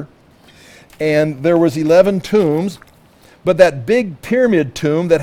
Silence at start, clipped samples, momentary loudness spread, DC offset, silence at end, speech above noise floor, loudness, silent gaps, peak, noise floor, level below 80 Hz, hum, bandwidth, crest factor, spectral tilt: 0 s; 0.1%; 7 LU; under 0.1%; 0 s; 33 dB; -15 LUFS; none; 0 dBFS; -47 dBFS; -50 dBFS; none; 15.5 kHz; 16 dB; -6.5 dB/octave